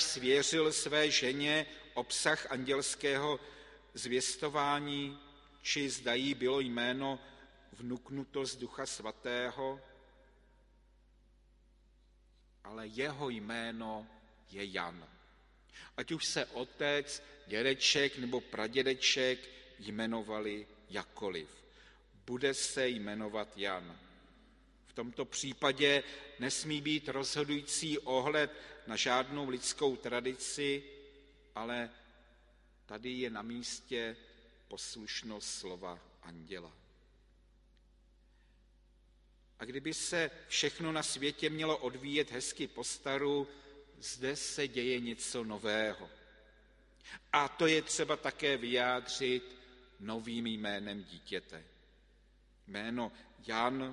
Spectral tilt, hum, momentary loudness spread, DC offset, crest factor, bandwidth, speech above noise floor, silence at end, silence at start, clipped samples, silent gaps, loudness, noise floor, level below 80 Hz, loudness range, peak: -2.5 dB/octave; none; 18 LU; under 0.1%; 24 dB; 11.5 kHz; 29 dB; 0 s; 0 s; under 0.1%; none; -36 LUFS; -66 dBFS; -66 dBFS; 10 LU; -12 dBFS